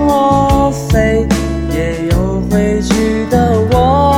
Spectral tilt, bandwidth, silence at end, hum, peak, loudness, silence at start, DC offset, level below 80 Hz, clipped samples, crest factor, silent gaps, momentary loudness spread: -6.5 dB/octave; 17 kHz; 0 s; none; 0 dBFS; -13 LUFS; 0 s; under 0.1%; -22 dBFS; under 0.1%; 10 dB; none; 5 LU